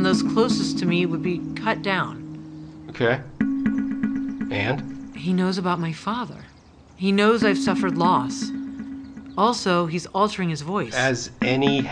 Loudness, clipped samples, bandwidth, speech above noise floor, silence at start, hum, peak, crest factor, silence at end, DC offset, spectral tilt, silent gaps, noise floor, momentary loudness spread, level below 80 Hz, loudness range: -23 LUFS; under 0.1%; 10.5 kHz; 27 dB; 0 s; none; -6 dBFS; 18 dB; 0 s; under 0.1%; -5.5 dB/octave; none; -49 dBFS; 15 LU; -54 dBFS; 4 LU